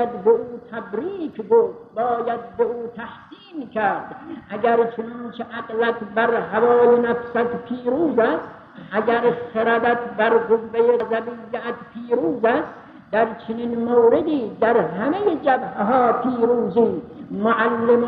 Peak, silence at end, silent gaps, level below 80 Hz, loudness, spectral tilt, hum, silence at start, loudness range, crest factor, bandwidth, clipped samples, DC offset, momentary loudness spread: -6 dBFS; 0 s; none; -60 dBFS; -20 LUFS; -9 dB/octave; none; 0 s; 5 LU; 14 dB; 4.6 kHz; under 0.1%; under 0.1%; 14 LU